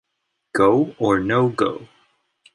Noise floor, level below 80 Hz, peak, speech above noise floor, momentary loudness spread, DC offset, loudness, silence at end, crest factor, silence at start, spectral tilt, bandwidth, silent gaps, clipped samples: -76 dBFS; -54 dBFS; -4 dBFS; 57 dB; 9 LU; under 0.1%; -19 LUFS; 0.7 s; 18 dB; 0.55 s; -7 dB/octave; 11.5 kHz; none; under 0.1%